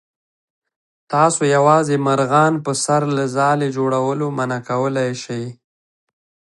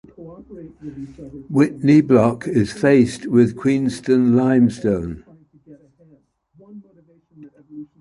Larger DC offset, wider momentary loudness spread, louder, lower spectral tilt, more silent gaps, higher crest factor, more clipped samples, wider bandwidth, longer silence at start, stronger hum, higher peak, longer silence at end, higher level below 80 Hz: neither; second, 9 LU vs 23 LU; about the same, -17 LUFS vs -17 LUFS; second, -5.5 dB/octave vs -7.5 dB/octave; neither; about the same, 18 dB vs 18 dB; neither; about the same, 11.5 kHz vs 11.5 kHz; first, 1.1 s vs 0.2 s; neither; about the same, 0 dBFS vs -2 dBFS; first, 1.05 s vs 0.15 s; second, -66 dBFS vs -50 dBFS